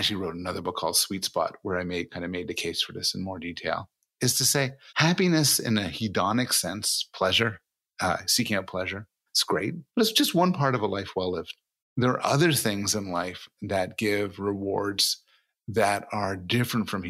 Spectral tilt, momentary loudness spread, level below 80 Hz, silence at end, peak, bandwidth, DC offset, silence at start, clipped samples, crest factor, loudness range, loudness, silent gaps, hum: -3.5 dB/octave; 11 LU; -62 dBFS; 0 s; -8 dBFS; 16 kHz; under 0.1%; 0 s; under 0.1%; 20 dB; 4 LU; -26 LUFS; 11.82-11.96 s; none